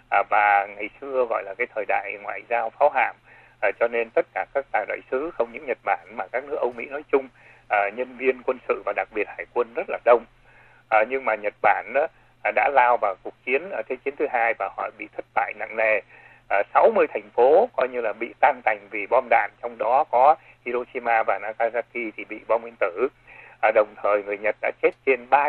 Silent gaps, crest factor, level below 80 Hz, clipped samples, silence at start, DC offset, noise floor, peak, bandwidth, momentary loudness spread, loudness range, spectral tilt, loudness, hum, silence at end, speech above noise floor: none; 20 dB; -64 dBFS; under 0.1%; 0.1 s; under 0.1%; -53 dBFS; -4 dBFS; 4.4 kHz; 10 LU; 5 LU; -6.5 dB/octave; -23 LUFS; none; 0 s; 30 dB